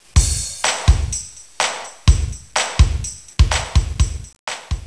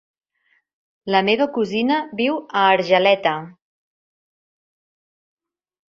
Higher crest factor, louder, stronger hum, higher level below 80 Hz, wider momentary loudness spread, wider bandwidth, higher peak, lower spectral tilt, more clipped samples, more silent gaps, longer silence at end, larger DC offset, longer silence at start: about the same, 18 dB vs 20 dB; about the same, -19 LUFS vs -18 LUFS; neither; first, -20 dBFS vs -68 dBFS; first, 10 LU vs 7 LU; first, 11 kHz vs 7.4 kHz; about the same, 0 dBFS vs -2 dBFS; second, -3.5 dB/octave vs -5.5 dB/octave; neither; first, 4.39-4.47 s vs none; second, 0 s vs 2.45 s; first, 0.4% vs under 0.1%; second, 0.15 s vs 1.05 s